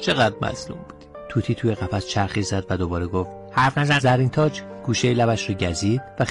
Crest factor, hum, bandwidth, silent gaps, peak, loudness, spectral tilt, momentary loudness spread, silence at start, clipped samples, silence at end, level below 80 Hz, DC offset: 14 dB; none; 11.5 kHz; none; -8 dBFS; -22 LUFS; -5.5 dB/octave; 10 LU; 0 s; under 0.1%; 0 s; -46 dBFS; under 0.1%